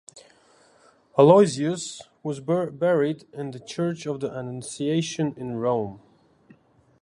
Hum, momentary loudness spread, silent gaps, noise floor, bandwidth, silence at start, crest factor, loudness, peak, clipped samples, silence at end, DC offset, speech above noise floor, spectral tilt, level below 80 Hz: none; 17 LU; none; -58 dBFS; 11.5 kHz; 0.15 s; 22 dB; -24 LUFS; -2 dBFS; under 0.1%; 1.05 s; under 0.1%; 35 dB; -6 dB/octave; -68 dBFS